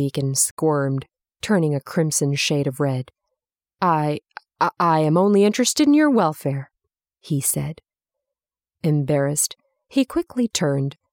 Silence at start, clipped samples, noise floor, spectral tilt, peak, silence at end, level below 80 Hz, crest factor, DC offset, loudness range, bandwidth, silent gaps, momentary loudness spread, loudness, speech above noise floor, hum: 0 s; under 0.1%; -88 dBFS; -5 dB/octave; -6 dBFS; 0.2 s; -60 dBFS; 16 dB; under 0.1%; 5 LU; 18 kHz; 0.51-0.57 s; 11 LU; -20 LUFS; 68 dB; none